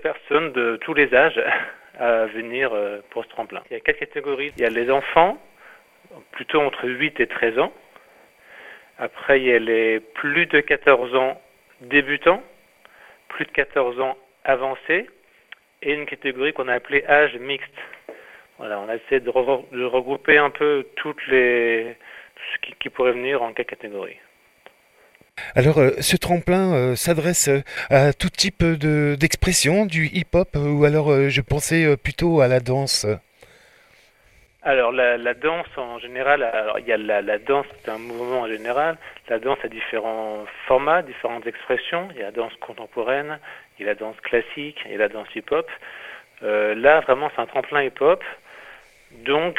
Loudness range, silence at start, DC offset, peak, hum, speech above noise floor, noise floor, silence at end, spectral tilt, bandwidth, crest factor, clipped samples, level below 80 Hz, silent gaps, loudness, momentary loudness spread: 6 LU; 0 s; under 0.1%; 0 dBFS; none; 35 dB; -56 dBFS; 0 s; -4.5 dB/octave; 16 kHz; 20 dB; under 0.1%; -44 dBFS; none; -21 LUFS; 15 LU